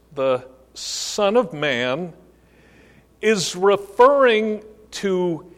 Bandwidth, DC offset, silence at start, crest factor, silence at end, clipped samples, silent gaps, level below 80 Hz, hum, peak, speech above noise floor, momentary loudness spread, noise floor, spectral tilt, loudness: 15 kHz; under 0.1%; 0.15 s; 18 dB; 0.1 s; under 0.1%; none; -58 dBFS; none; -2 dBFS; 33 dB; 15 LU; -52 dBFS; -4 dB/octave; -20 LUFS